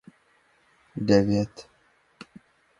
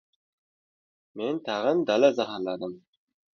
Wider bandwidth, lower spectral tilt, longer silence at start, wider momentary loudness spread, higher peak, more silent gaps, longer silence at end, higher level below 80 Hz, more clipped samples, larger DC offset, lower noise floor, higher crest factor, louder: first, 10.5 kHz vs 7 kHz; first, -7 dB/octave vs -5.5 dB/octave; second, 0.95 s vs 1.15 s; first, 27 LU vs 14 LU; first, -4 dBFS vs -8 dBFS; neither; first, 1.2 s vs 0.55 s; first, -54 dBFS vs -76 dBFS; neither; neither; second, -64 dBFS vs under -90 dBFS; about the same, 24 dB vs 22 dB; about the same, -24 LUFS vs -26 LUFS